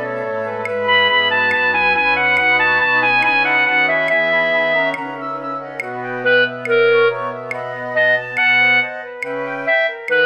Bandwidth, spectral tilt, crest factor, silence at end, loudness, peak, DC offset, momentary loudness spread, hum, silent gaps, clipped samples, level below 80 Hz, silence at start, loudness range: 9.2 kHz; -4.5 dB/octave; 14 dB; 0 s; -15 LUFS; -4 dBFS; under 0.1%; 12 LU; none; none; under 0.1%; -56 dBFS; 0 s; 4 LU